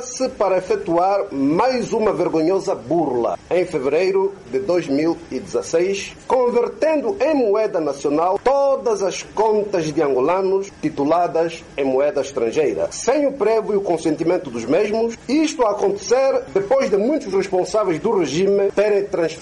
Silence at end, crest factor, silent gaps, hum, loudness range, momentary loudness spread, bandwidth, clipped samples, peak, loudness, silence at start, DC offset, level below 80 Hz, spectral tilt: 0 s; 10 dB; none; none; 1 LU; 5 LU; 11.5 kHz; under 0.1%; -8 dBFS; -19 LUFS; 0 s; under 0.1%; -52 dBFS; -5 dB/octave